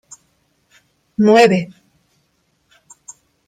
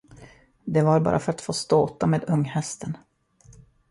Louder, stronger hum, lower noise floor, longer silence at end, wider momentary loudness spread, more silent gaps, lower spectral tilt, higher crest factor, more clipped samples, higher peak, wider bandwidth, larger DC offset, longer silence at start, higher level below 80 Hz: first, -13 LUFS vs -24 LUFS; neither; first, -64 dBFS vs -54 dBFS; first, 1.8 s vs 0.4 s; first, 29 LU vs 14 LU; neither; about the same, -5.5 dB/octave vs -6.5 dB/octave; about the same, 18 dB vs 18 dB; neither; first, 0 dBFS vs -8 dBFS; first, 13.5 kHz vs 11.5 kHz; neither; first, 1.2 s vs 0.2 s; second, -62 dBFS vs -54 dBFS